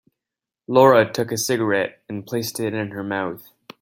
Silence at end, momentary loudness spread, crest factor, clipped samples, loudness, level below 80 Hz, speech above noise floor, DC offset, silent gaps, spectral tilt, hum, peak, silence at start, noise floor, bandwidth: 0.4 s; 14 LU; 20 dB; under 0.1%; -20 LUFS; -66 dBFS; 67 dB; under 0.1%; none; -4.5 dB/octave; none; -2 dBFS; 0.7 s; -87 dBFS; 17 kHz